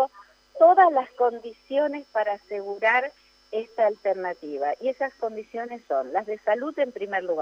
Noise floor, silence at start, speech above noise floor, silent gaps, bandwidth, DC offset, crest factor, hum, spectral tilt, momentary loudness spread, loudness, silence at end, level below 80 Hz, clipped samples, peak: -51 dBFS; 0 s; 27 dB; none; 6.8 kHz; under 0.1%; 18 dB; none; -5 dB/octave; 15 LU; -25 LUFS; 0 s; -72 dBFS; under 0.1%; -6 dBFS